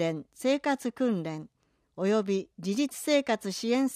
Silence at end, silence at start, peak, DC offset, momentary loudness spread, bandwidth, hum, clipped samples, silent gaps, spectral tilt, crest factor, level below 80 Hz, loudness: 0 s; 0 s; -12 dBFS; under 0.1%; 6 LU; 15.5 kHz; none; under 0.1%; none; -5 dB/octave; 16 dB; -74 dBFS; -29 LUFS